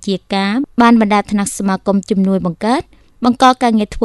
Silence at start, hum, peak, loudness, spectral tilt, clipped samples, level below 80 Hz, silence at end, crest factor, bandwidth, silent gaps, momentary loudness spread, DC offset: 0 s; none; 0 dBFS; -14 LUFS; -5.5 dB/octave; 0.1%; -42 dBFS; 0 s; 14 dB; 12.5 kHz; none; 7 LU; under 0.1%